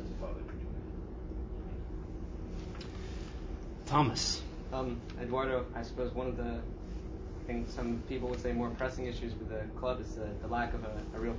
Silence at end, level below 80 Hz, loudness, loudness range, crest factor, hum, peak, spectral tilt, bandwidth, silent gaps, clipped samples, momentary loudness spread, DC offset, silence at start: 0 s; -42 dBFS; -38 LUFS; 8 LU; 22 dB; none; -16 dBFS; -5.5 dB/octave; 7.8 kHz; none; under 0.1%; 11 LU; under 0.1%; 0 s